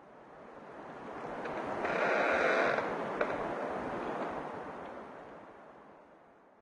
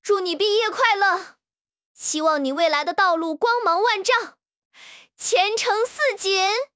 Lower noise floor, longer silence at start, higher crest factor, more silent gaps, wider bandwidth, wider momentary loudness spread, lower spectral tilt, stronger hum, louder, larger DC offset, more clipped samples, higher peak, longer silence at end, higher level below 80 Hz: second, -60 dBFS vs under -90 dBFS; about the same, 0 s vs 0.05 s; about the same, 20 dB vs 18 dB; second, none vs 1.61-1.65 s, 1.85-1.95 s, 4.57-4.71 s; first, 11 kHz vs 8 kHz; first, 23 LU vs 4 LU; first, -5 dB/octave vs 0 dB/octave; neither; second, -34 LUFS vs -20 LUFS; neither; neither; second, -16 dBFS vs -4 dBFS; first, 0.3 s vs 0.1 s; first, -66 dBFS vs -76 dBFS